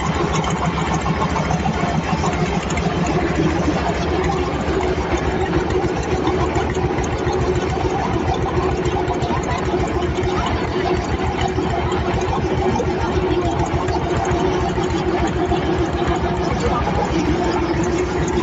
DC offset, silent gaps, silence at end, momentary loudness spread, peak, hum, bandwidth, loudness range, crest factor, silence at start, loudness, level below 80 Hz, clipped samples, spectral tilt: under 0.1%; none; 0 s; 1 LU; -4 dBFS; none; 8 kHz; 1 LU; 14 dB; 0 s; -20 LUFS; -28 dBFS; under 0.1%; -6 dB/octave